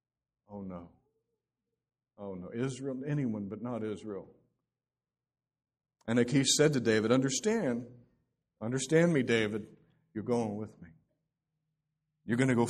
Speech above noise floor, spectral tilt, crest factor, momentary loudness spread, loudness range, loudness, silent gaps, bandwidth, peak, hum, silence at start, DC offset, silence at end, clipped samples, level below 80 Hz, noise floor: over 59 dB; -4.5 dB/octave; 22 dB; 19 LU; 10 LU; -31 LUFS; none; 13 kHz; -12 dBFS; none; 0.5 s; under 0.1%; 0 s; under 0.1%; -70 dBFS; under -90 dBFS